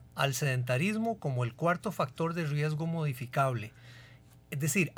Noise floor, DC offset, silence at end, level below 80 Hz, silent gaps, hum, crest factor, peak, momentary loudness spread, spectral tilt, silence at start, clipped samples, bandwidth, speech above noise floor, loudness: -56 dBFS; under 0.1%; 0.05 s; -66 dBFS; none; none; 18 dB; -14 dBFS; 9 LU; -5.5 dB/octave; 0 s; under 0.1%; over 20 kHz; 24 dB; -32 LUFS